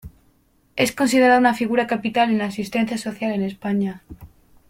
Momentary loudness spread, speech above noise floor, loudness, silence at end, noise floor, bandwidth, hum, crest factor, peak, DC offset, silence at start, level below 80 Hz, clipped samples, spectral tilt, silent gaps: 10 LU; 40 dB; -20 LUFS; 0.45 s; -60 dBFS; 16.5 kHz; none; 18 dB; -4 dBFS; under 0.1%; 0.05 s; -54 dBFS; under 0.1%; -5 dB/octave; none